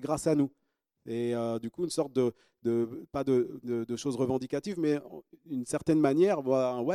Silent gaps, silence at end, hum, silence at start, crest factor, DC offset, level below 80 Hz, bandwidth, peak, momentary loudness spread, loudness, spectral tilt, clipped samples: none; 0 s; none; 0 s; 20 dB; under 0.1%; -66 dBFS; 15 kHz; -10 dBFS; 9 LU; -30 LUFS; -6.5 dB/octave; under 0.1%